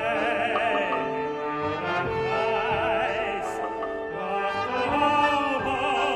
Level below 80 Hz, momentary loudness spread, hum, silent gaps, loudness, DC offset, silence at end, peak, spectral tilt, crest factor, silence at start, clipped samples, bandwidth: -54 dBFS; 7 LU; none; none; -26 LUFS; under 0.1%; 0 s; -10 dBFS; -5 dB/octave; 16 dB; 0 s; under 0.1%; 13 kHz